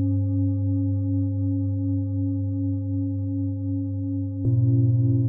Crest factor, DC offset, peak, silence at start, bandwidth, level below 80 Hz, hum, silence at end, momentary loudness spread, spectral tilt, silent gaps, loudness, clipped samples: 10 dB; under 0.1%; -12 dBFS; 0 s; 1.3 kHz; -56 dBFS; none; 0 s; 7 LU; -17 dB/octave; none; -25 LUFS; under 0.1%